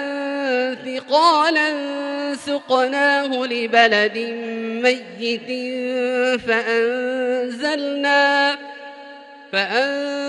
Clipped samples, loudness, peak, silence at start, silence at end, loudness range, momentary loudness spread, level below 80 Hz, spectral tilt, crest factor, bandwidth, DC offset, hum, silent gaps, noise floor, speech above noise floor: under 0.1%; -19 LUFS; -2 dBFS; 0 s; 0 s; 3 LU; 11 LU; -68 dBFS; -3 dB/octave; 18 dB; 11.5 kHz; under 0.1%; none; none; -40 dBFS; 21 dB